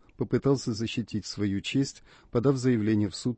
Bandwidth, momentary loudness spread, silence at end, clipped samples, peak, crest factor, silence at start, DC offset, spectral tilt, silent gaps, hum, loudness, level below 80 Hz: 8.6 kHz; 7 LU; 0 s; under 0.1%; -12 dBFS; 16 dB; 0.2 s; under 0.1%; -6.5 dB/octave; none; none; -28 LUFS; -56 dBFS